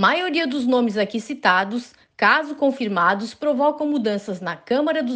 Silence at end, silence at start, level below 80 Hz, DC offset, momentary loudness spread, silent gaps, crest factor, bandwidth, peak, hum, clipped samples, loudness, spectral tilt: 0 s; 0 s; -68 dBFS; under 0.1%; 8 LU; none; 18 dB; 9.2 kHz; -4 dBFS; none; under 0.1%; -21 LUFS; -5 dB/octave